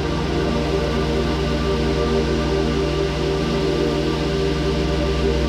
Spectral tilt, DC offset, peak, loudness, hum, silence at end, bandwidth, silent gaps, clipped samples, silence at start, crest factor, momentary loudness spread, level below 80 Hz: -6 dB/octave; under 0.1%; -6 dBFS; -21 LUFS; none; 0 s; 12.5 kHz; none; under 0.1%; 0 s; 12 dB; 1 LU; -26 dBFS